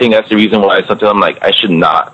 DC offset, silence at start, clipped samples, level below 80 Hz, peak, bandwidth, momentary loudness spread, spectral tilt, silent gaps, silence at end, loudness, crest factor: under 0.1%; 0 s; under 0.1%; -48 dBFS; 0 dBFS; 9.8 kHz; 2 LU; -6.5 dB/octave; none; 0.1 s; -9 LUFS; 10 dB